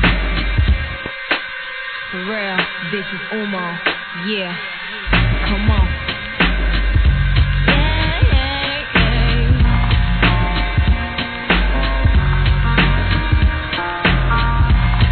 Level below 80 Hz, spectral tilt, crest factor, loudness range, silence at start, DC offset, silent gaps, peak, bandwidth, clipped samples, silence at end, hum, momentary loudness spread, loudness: -18 dBFS; -9 dB/octave; 16 dB; 5 LU; 0 s; 0.3%; none; 0 dBFS; 4.5 kHz; under 0.1%; 0 s; none; 7 LU; -17 LUFS